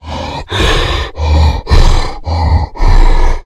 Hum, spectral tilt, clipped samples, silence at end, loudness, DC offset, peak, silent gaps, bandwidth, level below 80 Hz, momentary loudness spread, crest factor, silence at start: none; -5.5 dB/octave; 1%; 0.05 s; -13 LUFS; under 0.1%; 0 dBFS; none; 10 kHz; -10 dBFS; 7 LU; 8 dB; 0.05 s